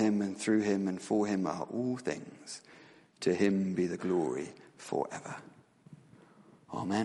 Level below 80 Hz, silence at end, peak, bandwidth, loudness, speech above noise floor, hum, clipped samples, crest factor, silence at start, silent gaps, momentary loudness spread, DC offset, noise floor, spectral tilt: -76 dBFS; 0 s; -14 dBFS; 11.5 kHz; -33 LUFS; 27 dB; none; under 0.1%; 18 dB; 0 s; none; 16 LU; under 0.1%; -59 dBFS; -6 dB/octave